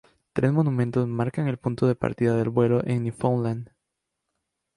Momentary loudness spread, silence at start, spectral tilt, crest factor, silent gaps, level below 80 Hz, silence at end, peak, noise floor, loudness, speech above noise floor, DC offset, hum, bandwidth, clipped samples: 5 LU; 0.35 s; -9 dB/octave; 18 dB; none; -56 dBFS; 1.1 s; -8 dBFS; -82 dBFS; -25 LUFS; 58 dB; under 0.1%; none; 11 kHz; under 0.1%